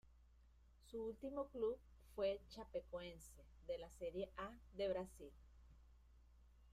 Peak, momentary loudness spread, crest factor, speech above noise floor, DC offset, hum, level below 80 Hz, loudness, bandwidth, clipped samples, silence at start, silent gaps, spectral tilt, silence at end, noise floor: -32 dBFS; 17 LU; 18 dB; 21 dB; under 0.1%; none; -66 dBFS; -49 LUFS; 15 kHz; under 0.1%; 0.05 s; none; -5.5 dB/octave; 0 s; -69 dBFS